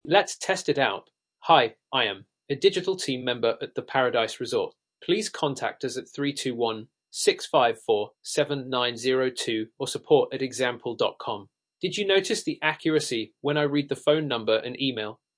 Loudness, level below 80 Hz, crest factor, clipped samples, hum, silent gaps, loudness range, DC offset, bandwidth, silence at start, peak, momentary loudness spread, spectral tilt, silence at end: -26 LUFS; -76 dBFS; 22 dB; under 0.1%; none; none; 3 LU; under 0.1%; 10.5 kHz; 0.05 s; -4 dBFS; 10 LU; -3.5 dB/octave; 0.25 s